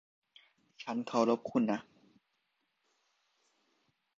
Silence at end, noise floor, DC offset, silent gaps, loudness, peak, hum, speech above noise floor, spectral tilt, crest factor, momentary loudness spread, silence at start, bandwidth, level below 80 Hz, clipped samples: 2.4 s; -81 dBFS; under 0.1%; none; -33 LUFS; -14 dBFS; none; 49 dB; -6 dB/octave; 24 dB; 9 LU; 0.8 s; 7.6 kHz; -82 dBFS; under 0.1%